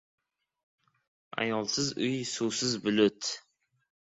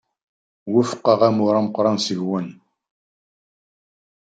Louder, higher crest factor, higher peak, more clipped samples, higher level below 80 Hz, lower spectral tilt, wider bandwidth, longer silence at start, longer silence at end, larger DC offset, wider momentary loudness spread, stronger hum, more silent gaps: second, -30 LUFS vs -19 LUFS; about the same, 20 dB vs 20 dB; second, -12 dBFS vs -2 dBFS; neither; about the same, -70 dBFS vs -70 dBFS; second, -3.5 dB/octave vs -6 dB/octave; about the same, 8.4 kHz vs 9.2 kHz; first, 1.35 s vs 0.65 s; second, 0.75 s vs 1.75 s; neither; about the same, 9 LU vs 11 LU; neither; neither